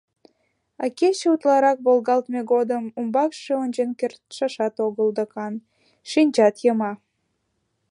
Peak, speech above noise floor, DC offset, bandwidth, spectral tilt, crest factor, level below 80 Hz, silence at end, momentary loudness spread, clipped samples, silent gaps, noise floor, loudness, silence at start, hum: -6 dBFS; 52 dB; under 0.1%; 11 kHz; -5 dB/octave; 18 dB; -78 dBFS; 0.95 s; 11 LU; under 0.1%; none; -73 dBFS; -22 LUFS; 0.8 s; none